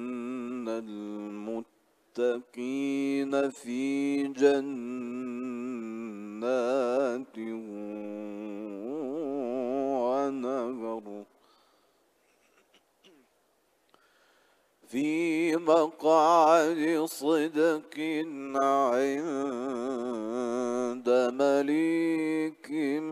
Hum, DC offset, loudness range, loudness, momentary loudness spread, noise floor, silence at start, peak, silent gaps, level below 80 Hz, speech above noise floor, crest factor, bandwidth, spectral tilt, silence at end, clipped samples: none; under 0.1%; 9 LU; -29 LUFS; 14 LU; -70 dBFS; 0 s; -10 dBFS; none; -82 dBFS; 43 dB; 20 dB; 15 kHz; -5 dB/octave; 0 s; under 0.1%